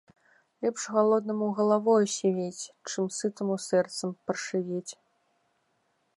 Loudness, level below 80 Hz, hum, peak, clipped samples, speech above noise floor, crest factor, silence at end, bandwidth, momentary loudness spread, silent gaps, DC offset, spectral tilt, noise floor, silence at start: -28 LUFS; -82 dBFS; none; -12 dBFS; under 0.1%; 46 dB; 18 dB; 1.25 s; 11.5 kHz; 11 LU; none; under 0.1%; -5 dB/octave; -73 dBFS; 0.6 s